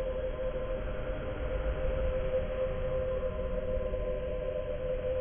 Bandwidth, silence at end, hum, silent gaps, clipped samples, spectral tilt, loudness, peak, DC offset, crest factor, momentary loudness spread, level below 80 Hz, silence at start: 3.6 kHz; 0 s; none; none; under 0.1%; -10.5 dB/octave; -35 LUFS; -20 dBFS; under 0.1%; 12 dB; 4 LU; -38 dBFS; 0 s